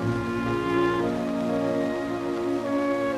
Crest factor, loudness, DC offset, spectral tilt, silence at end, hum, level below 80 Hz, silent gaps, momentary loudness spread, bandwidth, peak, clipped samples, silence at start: 14 dB; -26 LUFS; under 0.1%; -7 dB/octave; 0 s; none; -50 dBFS; none; 4 LU; 13.5 kHz; -12 dBFS; under 0.1%; 0 s